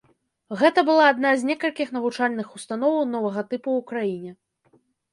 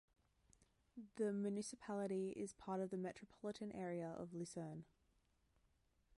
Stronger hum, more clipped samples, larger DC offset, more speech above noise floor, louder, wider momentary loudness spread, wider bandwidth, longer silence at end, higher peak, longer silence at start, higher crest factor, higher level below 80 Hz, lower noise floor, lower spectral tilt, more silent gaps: neither; neither; neither; first, 41 dB vs 34 dB; first, -22 LUFS vs -47 LUFS; first, 14 LU vs 10 LU; about the same, 11.5 kHz vs 11.5 kHz; second, 0.8 s vs 1.35 s; first, -4 dBFS vs -32 dBFS; second, 0.5 s vs 0.95 s; about the same, 20 dB vs 18 dB; first, -74 dBFS vs -80 dBFS; second, -63 dBFS vs -80 dBFS; about the same, -5 dB/octave vs -6 dB/octave; neither